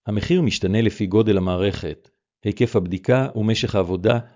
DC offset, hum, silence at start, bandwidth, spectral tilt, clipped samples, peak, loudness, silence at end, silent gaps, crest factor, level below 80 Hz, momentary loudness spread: under 0.1%; none; 0.05 s; 7.6 kHz; -6.5 dB/octave; under 0.1%; -4 dBFS; -21 LUFS; 0.1 s; none; 16 dB; -40 dBFS; 10 LU